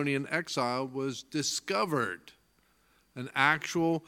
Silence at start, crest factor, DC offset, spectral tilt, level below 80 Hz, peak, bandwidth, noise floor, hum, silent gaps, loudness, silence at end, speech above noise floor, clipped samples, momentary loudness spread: 0 s; 24 dB; under 0.1%; -4 dB/octave; -72 dBFS; -8 dBFS; 17.5 kHz; -69 dBFS; none; none; -30 LUFS; 0.1 s; 38 dB; under 0.1%; 10 LU